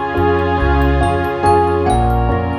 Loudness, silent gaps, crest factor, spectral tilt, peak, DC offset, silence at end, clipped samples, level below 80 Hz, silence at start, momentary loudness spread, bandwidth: -15 LUFS; none; 12 dB; -7.5 dB/octave; -2 dBFS; under 0.1%; 0 s; under 0.1%; -22 dBFS; 0 s; 2 LU; 13.5 kHz